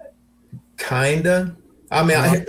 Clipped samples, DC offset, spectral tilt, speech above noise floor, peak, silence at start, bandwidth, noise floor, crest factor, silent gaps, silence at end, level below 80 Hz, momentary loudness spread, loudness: under 0.1%; under 0.1%; -5.5 dB/octave; 30 dB; -4 dBFS; 0.55 s; 16.5 kHz; -48 dBFS; 16 dB; none; 0 s; -50 dBFS; 14 LU; -19 LUFS